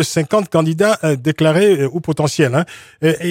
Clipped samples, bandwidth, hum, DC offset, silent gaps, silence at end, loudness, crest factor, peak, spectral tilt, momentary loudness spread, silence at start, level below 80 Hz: under 0.1%; 16.5 kHz; none; under 0.1%; none; 0 s; -15 LUFS; 14 dB; 0 dBFS; -5.5 dB/octave; 6 LU; 0 s; -54 dBFS